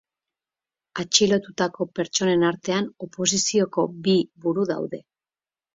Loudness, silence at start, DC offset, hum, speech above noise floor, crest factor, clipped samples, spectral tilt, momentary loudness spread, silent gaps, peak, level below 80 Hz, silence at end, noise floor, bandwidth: -23 LUFS; 0.95 s; under 0.1%; none; over 67 dB; 22 dB; under 0.1%; -3.5 dB/octave; 12 LU; none; -2 dBFS; -64 dBFS; 0.75 s; under -90 dBFS; 7.8 kHz